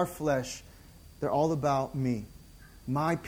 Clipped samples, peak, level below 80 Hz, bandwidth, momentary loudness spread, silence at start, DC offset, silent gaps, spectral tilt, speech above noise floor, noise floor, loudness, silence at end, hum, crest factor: under 0.1%; -14 dBFS; -54 dBFS; 20 kHz; 15 LU; 0 s; under 0.1%; none; -6.5 dB/octave; 23 dB; -52 dBFS; -31 LUFS; 0 s; none; 16 dB